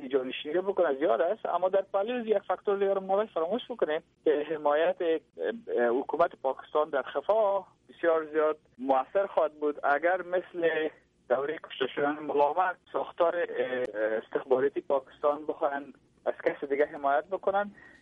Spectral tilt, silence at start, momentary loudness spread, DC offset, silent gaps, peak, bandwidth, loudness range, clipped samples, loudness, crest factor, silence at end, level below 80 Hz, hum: -7 dB/octave; 0 s; 6 LU; under 0.1%; none; -12 dBFS; 4.7 kHz; 2 LU; under 0.1%; -29 LUFS; 16 dB; 0.15 s; -74 dBFS; none